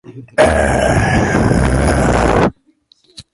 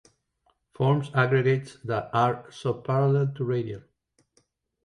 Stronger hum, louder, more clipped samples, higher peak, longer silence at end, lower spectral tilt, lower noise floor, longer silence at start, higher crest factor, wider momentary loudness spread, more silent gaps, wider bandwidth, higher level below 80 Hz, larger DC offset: neither; first, -13 LUFS vs -26 LUFS; neither; first, 0 dBFS vs -10 dBFS; second, 0.15 s vs 1.05 s; second, -6 dB/octave vs -8 dB/octave; second, -54 dBFS vs -71 dBFS; second, 0.1 s vs 0.8 s; about the same, 14 dB vs 18 dB; second, 3 LU vs 9 LU; neither; first, 11.5 kHz vs 10 kHz; first, -22 dBFS vs -64 dBFS; neither